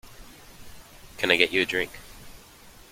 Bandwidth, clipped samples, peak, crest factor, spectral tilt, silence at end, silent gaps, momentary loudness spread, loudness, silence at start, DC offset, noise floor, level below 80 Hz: 16.5 kHz; under 0.1%; -2 dBFS; 26 dB; -3 dB/octave; 0.2 s; none; 26 LU; -23 LUFS; 0.05 s; under 0.1%; -50 dBFS; -52 dBFS